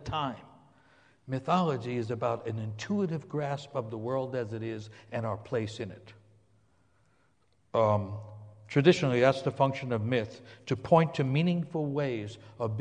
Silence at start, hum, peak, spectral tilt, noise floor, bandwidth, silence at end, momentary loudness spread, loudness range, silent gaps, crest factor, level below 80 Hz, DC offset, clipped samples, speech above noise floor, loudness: 0 s; none; -8 dBFS; -7 dB/octave; -70 dBFS; 9.8 kHz; 0 s; 15 LU; 9 LU; none; 22 dB; -62 dBFS; under 0.1%; under 0.1%; 41 dB; -30 LUFS